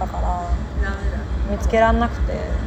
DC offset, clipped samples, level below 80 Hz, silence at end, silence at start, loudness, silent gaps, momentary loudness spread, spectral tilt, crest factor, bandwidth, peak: under 0.1%; under 0.1%; -24 dBFS; 0 s; 0 s; -22 LUFS; none; 9 LU; -7 dB/octave; 16 dB; 8.2 kHz; -4 dBFS